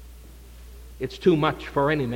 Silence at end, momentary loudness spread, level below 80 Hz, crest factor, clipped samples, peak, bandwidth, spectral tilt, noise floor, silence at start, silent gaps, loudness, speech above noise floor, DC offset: 0 s; 22 LU; -44 dBFS; 18 dB; under 0.1%; -8 dBFS; 17 kHz; -7 dB/octave; -44 dBFS; 0 s; none; -24 LUFS; 21 dB; under 0.1%